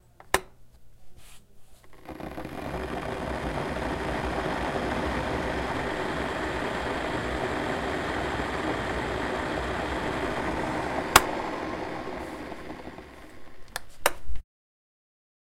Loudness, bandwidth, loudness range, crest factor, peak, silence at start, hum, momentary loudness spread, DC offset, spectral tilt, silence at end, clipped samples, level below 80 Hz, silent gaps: -30 LUFS; 16 kHz; 9 LU; 30 dB; 0 dBFS; 0.2 s; none; 11 LU; under 0.1%; -4 dB/octave; 1 s; under 0.1%; -42 dBFS; none